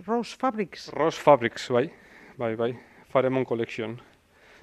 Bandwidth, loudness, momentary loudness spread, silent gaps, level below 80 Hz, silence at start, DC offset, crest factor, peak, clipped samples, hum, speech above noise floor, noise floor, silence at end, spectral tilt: 12.5 kHz; -26 LUFS; 13 LU; none; -66 dBFS; 0 s; under 0.1%; 24 dB; -4 dBFS; under 0.1%; none; 31 dB; -56 dBFS; 0.65 s; -6 dB/octave